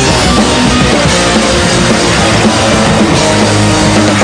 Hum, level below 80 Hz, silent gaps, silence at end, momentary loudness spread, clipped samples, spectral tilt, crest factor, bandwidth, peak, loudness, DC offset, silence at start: none; -22 dBFS; none; 0 s; 0 LU; 0.3%; -4 dB/octave; 8 dB; 10 kHz; 0 dBFS; -8 LUFS; under 0.1%; 0 s